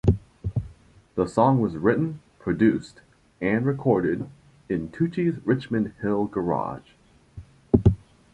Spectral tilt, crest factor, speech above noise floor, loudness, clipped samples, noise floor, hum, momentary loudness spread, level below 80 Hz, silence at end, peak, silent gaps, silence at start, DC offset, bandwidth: -9 dB/octave; 22 dB; 28 dB; -25 LUFS; under 0.1%; -52 dBFS; none; 12 LU; -40 dBFS; 0.4 s; -4 dBFS; none; 0.05 s; under 0.1%; 10.5 kHz